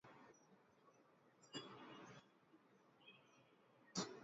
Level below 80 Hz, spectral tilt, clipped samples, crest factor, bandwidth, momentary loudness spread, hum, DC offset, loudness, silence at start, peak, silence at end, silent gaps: under -90 dBFS; -3 dB/octave; under 0.1%; 28 dB; 7.4 kHz; 19 LU; none; under 0.1%; -54 LUFS; 0.05 s; -32 dBFS; 0 s; none